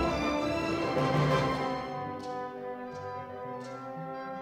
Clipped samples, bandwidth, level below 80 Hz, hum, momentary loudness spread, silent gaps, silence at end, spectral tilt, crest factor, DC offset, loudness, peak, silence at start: under 0.1%; 14.5 kHz; -52 dBFS; none; 13 LU; none; 0 s; -6 dB/octave; 18 dB; under 0.1%; -33 LUFS; -14 dBFS; 0 s